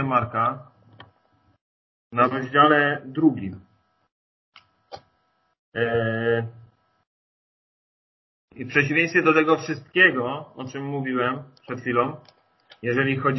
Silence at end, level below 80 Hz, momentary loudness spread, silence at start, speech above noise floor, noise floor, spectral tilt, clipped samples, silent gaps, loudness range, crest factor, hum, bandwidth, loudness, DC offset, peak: 0 s; -62 dBFS; 18 LU; 0 s; 47 dB; -69 dBFS; -6.5 dB/octave; under 0.1%; 1.61-2.10 s, 4.12-4.52 s, 5.59-5.72 s, 7.07-8.48 s; 8 LU; 22 dB; none; 6.2 kHz; -22 LUFS; under 0.1%; -4 dBFS